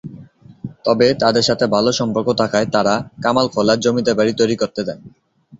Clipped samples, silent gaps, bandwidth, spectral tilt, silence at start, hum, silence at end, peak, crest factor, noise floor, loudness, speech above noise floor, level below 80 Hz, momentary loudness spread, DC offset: under 0.1%; none; 8 kHz; -4.5 dB/octave; 0.05 s; none; 0.05 s; -2 dBFS; 16 dB; -41 dBFS; -17 LUFS; 24 dB; -52 dBFS; 11 LU; under 0.1%